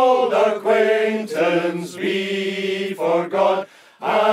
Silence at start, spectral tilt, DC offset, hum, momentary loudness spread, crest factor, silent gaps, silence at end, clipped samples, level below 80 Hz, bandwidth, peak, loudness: 0 s; -5 dB/octave; under 0.1%; none; 8 LU; 14 dB; none; 0 s; under 0.1%; -76 dBFS; 15 kHz; -4 dBFS; -20 LUFS